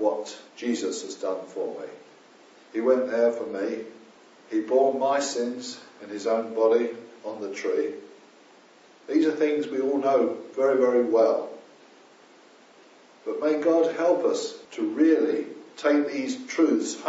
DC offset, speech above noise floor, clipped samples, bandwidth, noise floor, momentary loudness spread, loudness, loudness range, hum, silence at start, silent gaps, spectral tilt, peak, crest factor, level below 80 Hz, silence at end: under 0.1%; 30 dB; under 0.1%; 8 kHz; -54 dBFS; 15 LU; -25 LUFS; 4 LU; none; 0 s; none; -3 dB/octave; -8 dBFS; 18 dB; -86 dBFS; 0 s